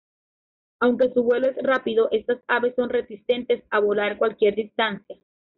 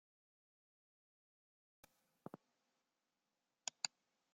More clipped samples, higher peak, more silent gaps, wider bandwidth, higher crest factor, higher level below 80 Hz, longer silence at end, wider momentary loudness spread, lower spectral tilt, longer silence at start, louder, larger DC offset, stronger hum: neither; first, -10 dBFS vs -20 dBFS; neither; second, 4.7 kHz vs 16 kHz; second, 14 dB vs 38 dB; first, -64 dBFS vs under -90 dBFS; about the same, 0.45 s vs 0.45 s; second, 5 LU vs 17 LU; first, -2.5 dB/octave vs -0.5 dB/octave; second, 0.8 s vs 2.35 s; first, -23 LUFS vs -47 LUFS; neither; neither